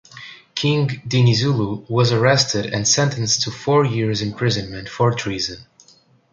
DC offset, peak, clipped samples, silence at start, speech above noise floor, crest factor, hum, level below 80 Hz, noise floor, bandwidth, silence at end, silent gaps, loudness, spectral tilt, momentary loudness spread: under 0.1%; -2 dBFS; under 0.1%; 0.15 s; 35 dB; 18 dB; none; -50 dBFS; -54 dBFS; 7.8 kHz; 0.7 s; none; -19 LUFS; -4.5 dB/octave; 10 LU